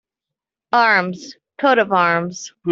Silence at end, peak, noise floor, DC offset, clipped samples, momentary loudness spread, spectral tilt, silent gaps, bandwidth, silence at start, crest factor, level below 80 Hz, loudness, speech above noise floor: 0 s; -2 dBFS; -86 dBFS; under 0.1%; under 0.1%; 15 LU; -4.5 dB/octave; none; 7.8 kHz; 0.75 s; 16 dB; -68 dBFS; -17 LUFS; 68 dB